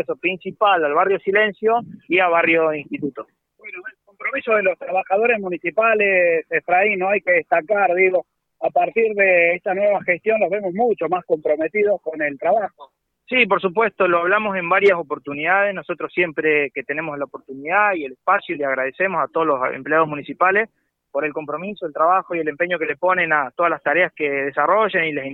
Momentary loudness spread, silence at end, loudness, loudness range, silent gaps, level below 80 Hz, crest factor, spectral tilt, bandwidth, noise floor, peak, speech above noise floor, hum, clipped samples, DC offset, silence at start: 10 LU; 0 s; -19 LUFS; 3 LU; none; -68 dBFS; 18 dB; -7.5 dB/octave; 4.9 kHz; -38 dBFS; -2 dBFS; 19 dB; none; under 0.1%; under 0.1%; 0 s